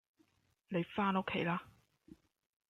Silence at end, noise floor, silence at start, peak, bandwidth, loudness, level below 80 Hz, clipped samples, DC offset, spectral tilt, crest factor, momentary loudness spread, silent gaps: 1 s; -75 dBFS; 0.7 s; -22 dBFS; 6.8 kHz; -37 LUFS; -74 dBFS; under 0.1%; under 0.1%; -8 dB/octave; 18 dB; 7 LU; none